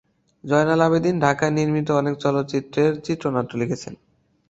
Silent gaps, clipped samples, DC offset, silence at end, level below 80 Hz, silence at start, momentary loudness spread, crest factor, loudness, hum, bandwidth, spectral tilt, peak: none; under 0.1%; under 0.1%; 0.55 s; -56 dBFS; 0.45 s; 9 LU; 20 dB; -21 LUFS; none; 8 kHz; -6.5 dB/octave; -2 dBFS